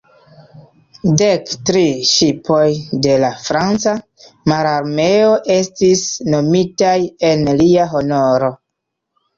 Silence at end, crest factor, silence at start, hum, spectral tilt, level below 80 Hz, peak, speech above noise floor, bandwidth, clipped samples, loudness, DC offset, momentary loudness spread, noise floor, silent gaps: 0.85 s; 12 dB; 0.55 s; none; -5 dB/octave; -50 dBFS; -2 dBFS; 62 dB; 7.6 kHz; under 0.1%; -14 LUFS; under 0.1%; 5 LU; -76 dBFS; none